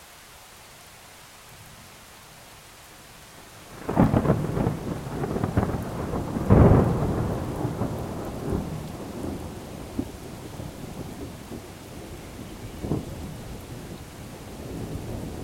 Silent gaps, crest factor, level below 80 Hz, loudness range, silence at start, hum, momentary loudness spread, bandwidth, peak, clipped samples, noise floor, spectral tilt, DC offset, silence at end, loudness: none; 26 dB; -38 dBFS; 14 LU; 0 s; none; 24 LU; 16.5 kHz; -2 dBFS; under 0.1%; -47 dBFS; -7.5 dB/octave; under 0.1%; 0 s; -27 LUFS